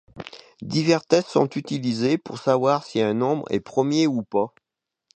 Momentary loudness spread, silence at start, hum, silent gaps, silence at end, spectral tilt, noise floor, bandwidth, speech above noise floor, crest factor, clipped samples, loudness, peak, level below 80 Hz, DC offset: 9 LU; 0.15 s; none; none; 0.7 s; -6 dB/octave; -66 dBFS; 9.2 kHz; 44 dB; 20 dB; under 0.1%; -23 LUFS; -4 dBFS; -64 dBFS; under 0.1%